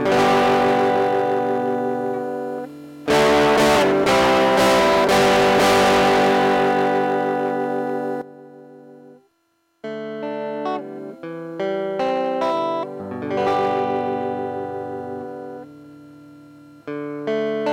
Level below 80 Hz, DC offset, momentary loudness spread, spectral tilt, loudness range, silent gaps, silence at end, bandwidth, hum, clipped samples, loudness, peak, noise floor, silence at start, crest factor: -50 dBFS; under 0.1%; 17 LU; -4.5 dB/octave; 14 LU; none; 0 s; 17 kHz; none; under 0.1%; -19 LUFS; -10 dBFS; -67 dBFS; 0 s; 10 dB